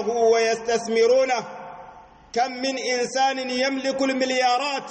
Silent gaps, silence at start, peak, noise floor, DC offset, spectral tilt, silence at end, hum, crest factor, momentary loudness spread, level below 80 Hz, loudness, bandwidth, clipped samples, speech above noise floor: none; 0 s; -8 dBFS; -46 dBFS; under 0.1%; -2.5 dB/octave; 0 s; none; 14 dB; 10 LU; -64 dBFS; -22 LUFS; 8.8 kHz; under 0.1%; 24 dB